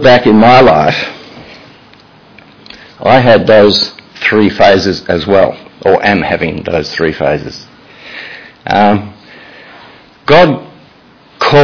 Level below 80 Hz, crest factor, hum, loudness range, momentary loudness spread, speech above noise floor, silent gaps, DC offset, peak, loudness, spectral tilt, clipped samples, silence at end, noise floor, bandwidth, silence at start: -40 dBFS; 10 dB; none; 6 LU; 21 LU; 34 dB; none; under 0.1%; 0 dBFS; -9 LUFS; -6 dB/octave; 2%; 0 s; -42 dBFS; 5.4 kHz; 0 s